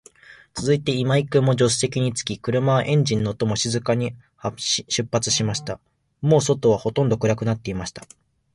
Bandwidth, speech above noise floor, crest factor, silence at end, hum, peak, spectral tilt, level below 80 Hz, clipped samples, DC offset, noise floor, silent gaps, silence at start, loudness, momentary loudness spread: 11.5 kHz; 27 dB; 16 dB; 0.5 s; none; -6 dBFS; -5 dB/octave; -50 dBFS; under 0.1%; under 0.1%; -48 dBFS; none; 0.3 s; -22 LUFS; 11 LU